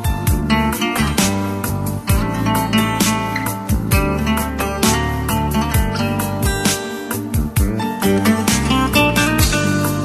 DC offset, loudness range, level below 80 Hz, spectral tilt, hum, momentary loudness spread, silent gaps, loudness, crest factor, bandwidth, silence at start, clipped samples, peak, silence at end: under 0.1%; 2 LU; -26 dBFS; -4.5 dB/octave; none; 6 LU; none; -17 LUFS; 16 dB; 13 kHz; 0 s; under 0.1%; 0 dBFS; 0 s